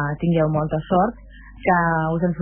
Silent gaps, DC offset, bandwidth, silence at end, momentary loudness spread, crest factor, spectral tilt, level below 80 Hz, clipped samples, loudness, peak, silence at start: none; under 0.1%; 3.4 kHz; 0 s; 5 LU; 16 dB; -12 dB/octave; -42 dBFS; under 0.1%; -21 LUFS; -4 dBFS; 0 s